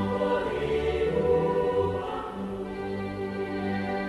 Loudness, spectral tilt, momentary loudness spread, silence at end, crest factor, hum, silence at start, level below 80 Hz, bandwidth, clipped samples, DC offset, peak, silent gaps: -28 LUFS; -7.5 dB/octave; 9 LU; 0 s; 16 dB; none; 0 s; -46 dBFS; 12 kHz; under 0.1%; under 0.1%; -12 dBFS; none